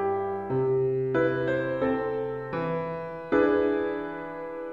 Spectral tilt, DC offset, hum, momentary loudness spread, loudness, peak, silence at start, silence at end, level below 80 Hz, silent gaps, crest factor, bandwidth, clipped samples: -9 dB/octave; 0.1%; none; 11 LU; -28 LUFS; -12 dBFS; 0 s; 0 s; -58 dBFS; none; 16 dB; 5.2 kHz; under 0.1%